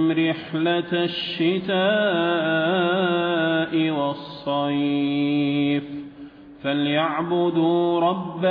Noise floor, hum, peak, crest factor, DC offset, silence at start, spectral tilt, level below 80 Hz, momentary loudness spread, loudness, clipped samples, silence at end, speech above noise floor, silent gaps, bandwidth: -42 dBFS; none; -8 dBFS; 14 dB; under 0.1%; 0 s; -9 dB/octave; -64 dBFS; 6 LU; -22 LUFS; under 0.1%; 0 s; 20 dB; none; 5.2 kHz